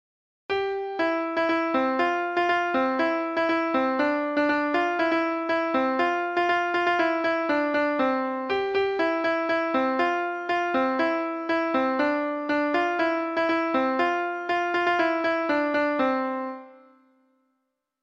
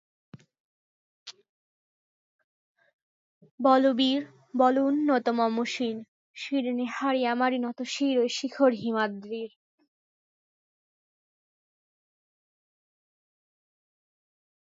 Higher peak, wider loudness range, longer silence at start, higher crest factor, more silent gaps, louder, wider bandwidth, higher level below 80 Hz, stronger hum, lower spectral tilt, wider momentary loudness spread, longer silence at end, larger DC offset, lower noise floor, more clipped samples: about the same, -10 dBFS vs -8 dBFS; second, 1 LU vs 6 LU; first, 0.5 s vs 0.35 s; second, 14 dB vs 22 dB; second, none vs 0.60-1.26 s, 1.49-2.75 s, 2.93-3.41 s, 3.51-3.58 s, 6.08-6.34 s; about the same, -25 LUFS vs -26 LUFS; about the same, 7.8 kHz vs 7.8 kHz; first, -66 dBFS vs -84 dBFS; neither; about the same, -4.5 dB/octave vs -4 dB/octave; second, 4 LU vs 15 LU; second, 1.3 s vs 5.2 s; neither; second, -78 dBFS vs under -90 dBFS; neither